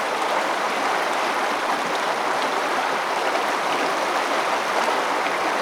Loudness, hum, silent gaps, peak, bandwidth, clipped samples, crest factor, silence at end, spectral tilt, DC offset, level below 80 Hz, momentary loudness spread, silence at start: -22 LUFS; none; none; -8 dBFS; over 20 kHz; under 0.1%; 14 dB; 0 s; -2 dB/octave; under 0.1%; -72 dBFS; 1 LU; 0 s